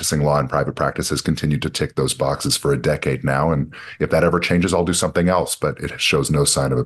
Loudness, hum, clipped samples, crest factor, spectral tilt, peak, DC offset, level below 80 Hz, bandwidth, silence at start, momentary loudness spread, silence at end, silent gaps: -19 LUFS; none; under 0.1%; 16 dB; -4.5 dB/octave; -2 dBFS; under 0.1%; -38 dBFS; 12.5 kHz; 0 s; 5 LU; 0 s; none